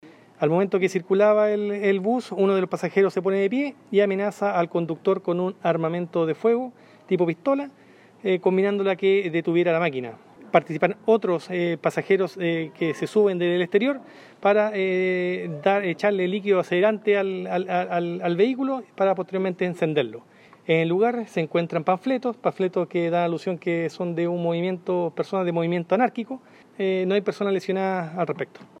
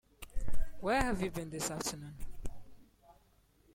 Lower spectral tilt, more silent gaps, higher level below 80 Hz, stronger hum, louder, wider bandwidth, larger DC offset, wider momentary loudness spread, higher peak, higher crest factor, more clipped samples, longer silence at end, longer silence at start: first, -7 dB/octave vs -4 dB/octave; neither; second, -78 dBFS vs -44 dBFS; neither; first, -23 LUFS vs -37 LUFS; second, 10.5 kHz vs 16 kHz; neither; second, 6 LU vs 18 LU; first, -4 dBFS vs -16 dBFS; about the same, 20 dB vs 18 dB; neither; second, 0.15 s vs 0.9 s; second, 0.05 s vs 0.2 s